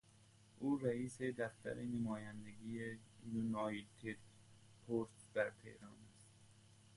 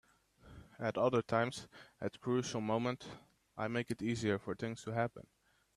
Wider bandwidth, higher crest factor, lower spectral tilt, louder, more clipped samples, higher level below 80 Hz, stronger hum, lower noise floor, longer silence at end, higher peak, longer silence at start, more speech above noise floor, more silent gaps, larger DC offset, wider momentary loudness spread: about the same, 11.5 kHz vs 12.5 kHz; about the same, 22 dB vs 20 dB; about the same, -6.5 dB/octave vs -6 dB/octave; second, -45 LUFS vs -38 LUFS; neither; about the same, -74 dBFS vs -70 dBFS; neither; first, -68 dBFS vs -63 dBFS; second, 0 s vs 0.55 s; second, -24 dBFS vs -18 dBFS; second, 0.2 s vs 0.45 s; about the same, 24 dB vs 26 dB; neither; neither; about the same, 19 LU vs 19 LU